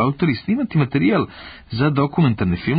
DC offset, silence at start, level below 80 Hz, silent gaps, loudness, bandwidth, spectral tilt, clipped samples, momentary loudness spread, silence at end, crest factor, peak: under 0.1%; 0 s; -42 dBFS; none; -19 LUFS; 5 kHz; -12.5 dB/octave; under 0.1%; 9 LU; 0 s; 12 dB; -6 dBFS